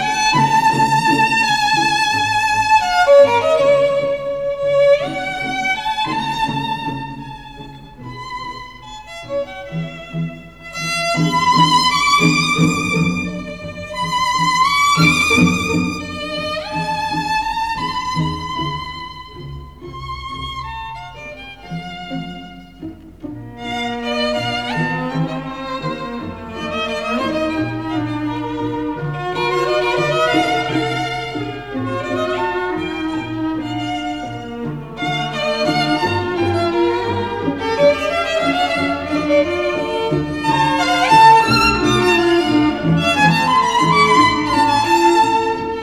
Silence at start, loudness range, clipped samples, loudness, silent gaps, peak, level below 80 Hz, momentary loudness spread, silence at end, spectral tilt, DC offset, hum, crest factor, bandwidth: 0 s; 14 LU; under 0.1%; -16 LUFS; none; 0 dBFS; -42 dBFS; 17 LU; 0 s; -4.5 dB/octave; 0.3%; none; 18 dB; 15.5 kHz